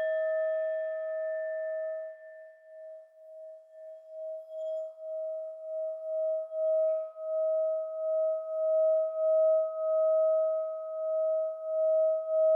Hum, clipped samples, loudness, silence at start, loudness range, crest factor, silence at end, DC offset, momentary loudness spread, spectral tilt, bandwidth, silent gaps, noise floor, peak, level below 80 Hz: none; under 0.1%; -31 LUFS; 0 s; 13 LU; 10 dB; 0 s; under 0.1%; 22 LU; -1 dB/octave; 3.5 kHz; none; -50 dBFS; -20 dBFS; under -90 dBFS